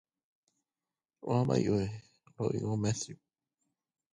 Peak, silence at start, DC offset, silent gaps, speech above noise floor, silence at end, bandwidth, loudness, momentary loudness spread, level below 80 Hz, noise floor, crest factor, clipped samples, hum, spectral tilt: -16 dBFS; 1.25 s; under 0.1%; none; over 59 dB; 1 s; 11 kHz; -33 LUFS; 14 LU; -62 dBFS; under -90 dBFS; 20 dB; under 0.1%; none; -6.5 dB/octave